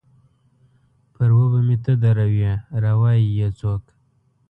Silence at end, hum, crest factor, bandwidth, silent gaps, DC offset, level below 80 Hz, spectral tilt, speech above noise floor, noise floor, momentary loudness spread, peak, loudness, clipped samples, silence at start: 0.7 s; none; 12 dB; 4 kHz; none; under 0.1%; -44 dBFS; -10.5 dB/octave; 44 dB; -62 dBFS; 7 LU; -8 dBFS; -19 LUFS; under 0.1%; 1.2 s